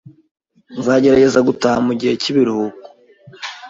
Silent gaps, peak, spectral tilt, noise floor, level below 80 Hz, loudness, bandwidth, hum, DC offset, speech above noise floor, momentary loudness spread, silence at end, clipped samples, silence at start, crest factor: none; -2 dBFS; -5.5 dB/octave; -44 dBFS; -52 dBFS; -15 LUFS; 7.8 kHz; none; under 0.1%; 30 dB; 17 LU; 0 s; under 0.1%; 0.7 s; 14 dB